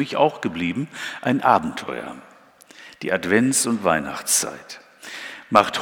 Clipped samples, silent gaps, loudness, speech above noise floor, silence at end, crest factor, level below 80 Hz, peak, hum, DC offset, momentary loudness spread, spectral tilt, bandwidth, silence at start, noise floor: under 0.1%; none; -21 LUFS; 28 dB; 0 s; 22 dB; -60 dBFS; 0 dBFS; none; under 0.1%; 19 LU; -3.5 dB/octave; 19 kHz; 0 s; -49 dBFS